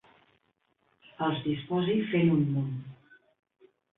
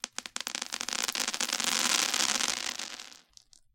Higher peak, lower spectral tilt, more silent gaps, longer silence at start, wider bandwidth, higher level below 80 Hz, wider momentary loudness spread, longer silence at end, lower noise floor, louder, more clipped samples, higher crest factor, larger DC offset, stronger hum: second, -14 dBFS vs -6 dBFS; first, -11 dB/octave vs 1.5 dB/octave; neither; first, 1.2 s vs 0.05 s; second, 4 kHz vs 17 kHz; about the same, -68 dBFS vs -72 dBFS; about the same, 11 LU vs 13 LU; first, 1.05 s vs 0.6 s; first, -74 dBFS vs -60 dBFS; about the same, -29 LUFS vs -29 LUFS; neither; second, 16 dB vs 28 dB; neither; neither